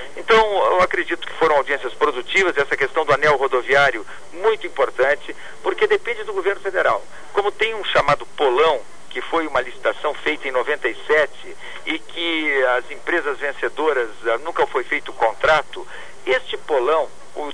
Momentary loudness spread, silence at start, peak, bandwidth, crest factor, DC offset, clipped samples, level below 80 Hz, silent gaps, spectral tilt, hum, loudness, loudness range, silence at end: 10 LU; 0 s; -4 dBFS; 10.5 kHz; 14 dB; 3%; under 0.1%; -50 dBFS; none; -3.5 dB/octave; none; -20 LUFS; 3 LU; 0 s